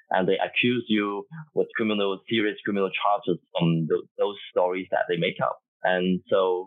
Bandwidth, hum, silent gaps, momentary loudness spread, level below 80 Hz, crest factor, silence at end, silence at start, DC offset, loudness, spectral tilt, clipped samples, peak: 4.1 kHz; none; 4.11-4.15 s, 5.68-5.80 s; 6 LU; -80 dBFS; 18 dB; 0 s; 0.1 s; under 0.1%; -26 LUFS; -9 dB/octave; under 0.1%; -8 dBFS